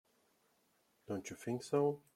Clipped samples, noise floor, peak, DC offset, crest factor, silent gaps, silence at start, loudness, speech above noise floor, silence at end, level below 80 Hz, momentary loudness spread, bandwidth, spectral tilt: under 0.1%; -76 dBFS; -20 dBFS; under 0.1%; 20 dB; none; 1.1 s; -39 LUFS; 38 dB; 0.15 s; -82 dBFS; 10 LU; 15 kHz; -6 dB/octave